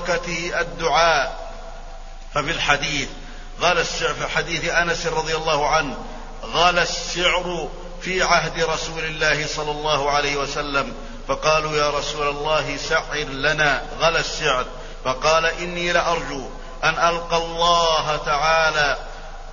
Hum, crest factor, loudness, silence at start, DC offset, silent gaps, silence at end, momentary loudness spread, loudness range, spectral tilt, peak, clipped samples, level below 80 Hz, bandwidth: none; 20 dB; -20 LUFS; 0 s; under 0.1%; none; 0 s; 13 LU; 2 LU; -2.5 dB/octave; -2 dBFS; under 0.1%; -34 dBFS; 7.4 kHz